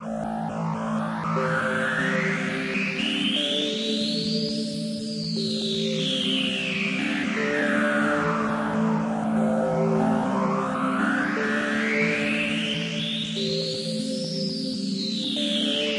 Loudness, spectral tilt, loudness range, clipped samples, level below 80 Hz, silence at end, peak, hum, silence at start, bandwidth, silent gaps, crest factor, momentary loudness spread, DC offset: -25 LUFS; -4.5 dB/octave; 2 LU; under 0.1%; -60 dBFS; 0 s; -10 dBFS; none; 0 s; 11.5 kHz; none; 14 dB; 5 LU; under 0.1%